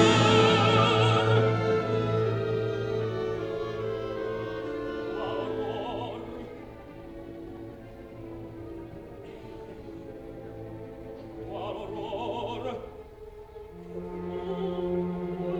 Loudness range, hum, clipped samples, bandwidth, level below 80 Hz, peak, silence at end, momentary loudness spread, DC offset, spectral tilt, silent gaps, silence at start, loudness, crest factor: 17 LU; none; under 0.1%; 9.8 kHz; -52 dBFS; -6 dBFS; 0 s; 22 LU; under 0.1%; -6 dB/octave; none; 0 s; -28 LUFS; 22 dB